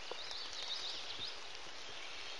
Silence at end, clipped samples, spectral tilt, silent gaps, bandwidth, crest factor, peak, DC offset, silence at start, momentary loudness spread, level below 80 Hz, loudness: 0 s; under 0.1%; 0 dB/octave; none; 11.5 kHz; 20 dB; -26 dBFS; 0.4%; 0 s; 7 LU; -74 dBFS; -43 LUFS